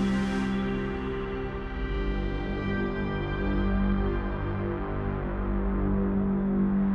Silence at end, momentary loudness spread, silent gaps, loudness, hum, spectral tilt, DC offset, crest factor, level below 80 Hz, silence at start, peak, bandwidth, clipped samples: 0 s; 5 LU; none; -29 LUFS; none; -8.5 dB/octave; under 0.1%; 12 dB; -34 dBFS; 0 s; -16 dBFS; 8.2 kHz; under 0.1%